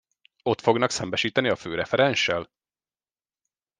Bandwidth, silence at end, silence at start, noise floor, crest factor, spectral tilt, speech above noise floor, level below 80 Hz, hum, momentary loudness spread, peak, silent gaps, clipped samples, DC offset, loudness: 10 kHz; 1.35 s; 0.45 s; under -90 dBFS; 22 dB; -4 dB/octave; over 66 dB; -64 dBFS; none; 7 LU; -4 dBFS; none; under 0.1%; under 0.1%; -24 LUFS